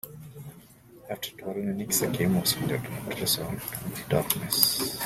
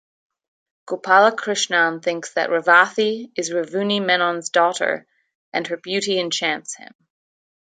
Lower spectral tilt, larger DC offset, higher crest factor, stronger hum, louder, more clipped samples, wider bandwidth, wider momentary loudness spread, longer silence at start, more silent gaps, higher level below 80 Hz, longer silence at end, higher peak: about the same, -3.5 dB/octave vs -2.5 dB/octave; neither; first, 30 dB vs 20 dB; neither; second, -27 LUFS vs -19 LUFS; neither; first, 16.5 kHz vs 9.6 kHz; first, 19 LU vs 13 LU; second, 0.05 s vs 0.85 s; second, none vs 5.35-5.52 s; first, -56 dBFS vs -76 dBFS; second, 0 s vs 0.95 s; about the same, 0 dBFS vs -2 dBFS